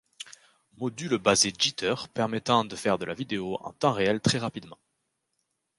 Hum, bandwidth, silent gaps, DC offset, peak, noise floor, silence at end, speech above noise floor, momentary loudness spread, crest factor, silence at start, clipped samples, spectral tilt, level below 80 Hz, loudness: none; 11.5 kHz; none; under 0.1%; -8 dBFS; -79 dBFS; 1.05 s; 51 dB; 13 LU; 22 dB; 0.2 s; under 0.1%; -3.5 dB/octave; -60 dBFS; -27 LUFS